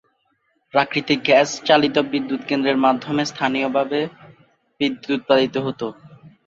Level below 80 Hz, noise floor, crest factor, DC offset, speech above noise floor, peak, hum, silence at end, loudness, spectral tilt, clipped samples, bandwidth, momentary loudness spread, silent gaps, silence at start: -64 dBFS; -67 dBFS; 20 dB; under 0.1%; 48 dB; -2 dBFS; none; 0.2 s; -20 LUFS; -4.5 dB/octave; under 0.1%; 7.8 kHz; 9 LU; none; 0.75 s